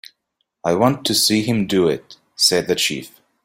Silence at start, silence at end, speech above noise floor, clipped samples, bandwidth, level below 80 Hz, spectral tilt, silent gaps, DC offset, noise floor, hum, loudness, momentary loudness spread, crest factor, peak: 0.65 s; 0.35 s; 55 dB; under 0.1%; 16 kHz; -56 dBFS; -3.5 dB/octave; none; under 0.1%; -73 dBFS; none; -18 LUFS; 9 LU; 18 dB; -2 dBFS